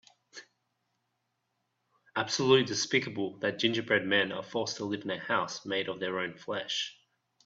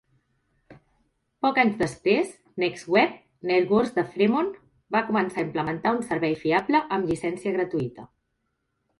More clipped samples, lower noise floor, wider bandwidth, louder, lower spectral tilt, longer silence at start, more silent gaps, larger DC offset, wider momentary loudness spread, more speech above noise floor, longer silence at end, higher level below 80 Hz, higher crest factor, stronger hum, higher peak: neither; first, -81 dBFS vs -76 dBFS; second, 7.8 kHz vs 11.5 kHz; second, -30 LUFS vs -25 LUFS; second, -3.5 dB/octave vs -6 dB/octave; second, 0.35 s vs 0.7 s; neither; neither; first, 12 LU vs 7 LU; about the same, 50 dB vs 52 dB; second, 0.55 s vs 0.95 s; second, -74 dBFS vs -60 dBFS; first, 24 dB vs 18 dB; neither; second, -10 dBFS vs -6 dBFS